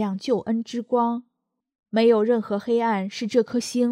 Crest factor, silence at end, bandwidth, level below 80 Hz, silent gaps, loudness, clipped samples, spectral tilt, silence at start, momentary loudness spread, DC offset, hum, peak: 16 dB; 0 s; 13.5 kHz; -72 dBFS; 1.75-1.79 s; -23 LUFS; under 0.1%; -5.5 dB/octave; 0 s; 8 LU; under 0.1%; none; -8 dBFS